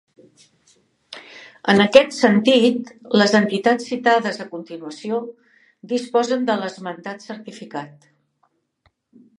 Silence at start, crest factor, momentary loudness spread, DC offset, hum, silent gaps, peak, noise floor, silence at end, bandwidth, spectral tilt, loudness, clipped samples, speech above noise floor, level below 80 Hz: 1.1 s; 20 dB; 21 LU; under 0.1%; none; none; 0 dBFS; -67 dBFS; 1.5 s; 11 kHz; -5 dB/octave; -18 LUFS; under 0.1%; 48 dB; -66 dBFS